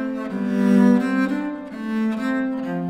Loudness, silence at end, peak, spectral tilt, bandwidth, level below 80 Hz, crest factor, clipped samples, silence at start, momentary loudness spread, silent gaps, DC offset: -21 LUFS; 0 s; -6 dBFS; -8 dB/octave; 11 kHz; -60 dBFS; 16 dB; under 0.1%; 0 s; 11 LU; none; under 0.1%